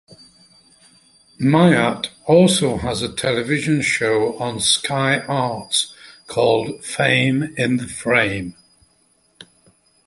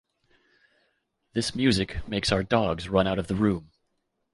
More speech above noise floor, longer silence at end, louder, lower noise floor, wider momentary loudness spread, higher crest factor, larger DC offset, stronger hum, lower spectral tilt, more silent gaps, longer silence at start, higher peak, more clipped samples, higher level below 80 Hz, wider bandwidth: second, 42 dB vs 51 dB; first, 1.55 s vs 0.7 s; first, -18 LUFS vs -26 LUFS; second, -60 dBFS vs -76 dBFS; first, 9 LU vs 6 LU; about the same, 18 dB vs 20 dB; neither; neither; about the same, -4.5 dB/octave vs -5.5 dB/octave; neither; second, 0.1 s vs 1.35 s; first, 0 dBFS vs -6 dBFS; neither; about the same, -50 dBFS vs -46 dBFS; about the same, 12 kHz vs 11.5 kHz